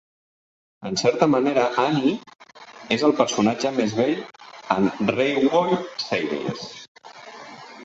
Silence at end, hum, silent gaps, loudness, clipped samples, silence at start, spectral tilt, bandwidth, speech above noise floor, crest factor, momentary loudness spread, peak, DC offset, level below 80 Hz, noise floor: 0 s; none; 6.88-6.95 s; -22 LUFS; under 0.1%; 0.8 s; -5 dB/octave; 8 kHz; 21 dB; 22 dB; 21 LU; -2 dBFS; under 0.1%; -64 dBFS; -42 dBFS